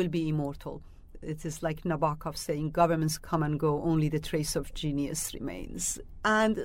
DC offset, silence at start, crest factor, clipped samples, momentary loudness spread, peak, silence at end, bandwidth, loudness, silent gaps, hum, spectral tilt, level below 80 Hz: under 0.1%; 0 s; 18 dB; under 0.1%; 12 LU; -12 dBFS; 0 s; 16 kHz; -30 LUFS; none; none; -5 dB/octave; -46 dBFS